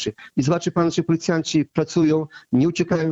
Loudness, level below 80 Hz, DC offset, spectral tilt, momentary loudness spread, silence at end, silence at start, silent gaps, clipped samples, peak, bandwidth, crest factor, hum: -21 LUFS; -54 dBFS; under 0.1%; -6 dB/octave; 4 LU; 0 s; 0 s; none; under 0.1%; -4 dBFS; 8 kHz; 16 dB; none